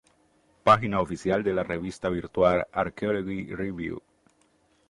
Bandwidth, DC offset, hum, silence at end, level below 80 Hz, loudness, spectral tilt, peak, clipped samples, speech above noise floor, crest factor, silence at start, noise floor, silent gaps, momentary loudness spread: 11.5 kHz; under 0.1%; none; 0.9 s; -52 dBFS; -26 LUFS; -6.5 dB/octave; -6 dBFS; under 0.1%; 40 dB; 22 dB; 0.65 s; -65 dBFS; none; 12 LU